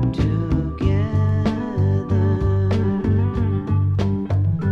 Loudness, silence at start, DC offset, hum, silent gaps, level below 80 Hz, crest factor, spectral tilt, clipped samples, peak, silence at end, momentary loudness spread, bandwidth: -20 LUFS; 0 s; under 0.1%; none; none; -32 dBFS; 14 dB; -9.5 dB/octave; under 0.1%; -6 dBFS; 0 s; 2 LU; 6 kHz